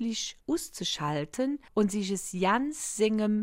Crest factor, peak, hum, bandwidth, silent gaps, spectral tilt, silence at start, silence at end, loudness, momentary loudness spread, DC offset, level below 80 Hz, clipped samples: 16 dB; -14 dBFS; none; 16 kHz; none; -4 dB/octave; 0 s; 0 s; -30 LUFS; 6 LU; under 0.1%; -60 dBFS; under 0.1%